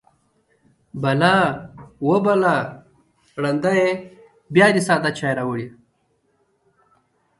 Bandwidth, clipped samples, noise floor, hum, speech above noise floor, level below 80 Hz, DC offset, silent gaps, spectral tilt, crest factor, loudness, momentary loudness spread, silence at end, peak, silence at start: 11.5 kHz; under 0.1%; -66 dBFS; none; 48 dB; -60 dBFS; under 0.1%; none; -6 dB/octave; 20 dB; -19 LUFS; 18 LU; 1.7 s; -2 dBFS; 0.95 s